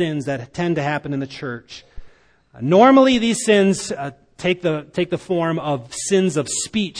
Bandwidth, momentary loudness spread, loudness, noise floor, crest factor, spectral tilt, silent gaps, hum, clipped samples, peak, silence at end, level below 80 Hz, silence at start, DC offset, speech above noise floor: 10.5 kHz; 16 LU; -19 LUFS; -50 dBFS; 18 dB; -5 dB/octave; none; none; under 0.1%; 0 dBFS; 0 s; -50 dBFS; 0 s; under 0.1%; 31 dB